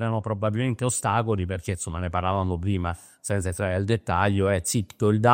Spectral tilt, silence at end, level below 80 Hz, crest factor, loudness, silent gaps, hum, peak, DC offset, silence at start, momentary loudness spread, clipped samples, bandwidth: -5.5 dB/octave; 0 s; -52 dBFS; 20 dB; -26 LUFS; none; none; -4 dBFS; under 0.1%; 0 s; 7 LU; under 0.1%; 16 kHz